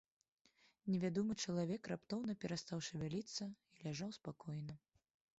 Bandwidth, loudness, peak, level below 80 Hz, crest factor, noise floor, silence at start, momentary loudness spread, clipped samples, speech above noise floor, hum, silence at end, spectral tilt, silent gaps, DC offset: 8 kHz; -45 LUFS; -28 dBFS; -76 dBFS; 16 dB; -75 dBFS; 0.85 s; 11 LU; under 0.1%; 32 dB; none; 0.65 s; -6 dB/octave; none; under 0.1%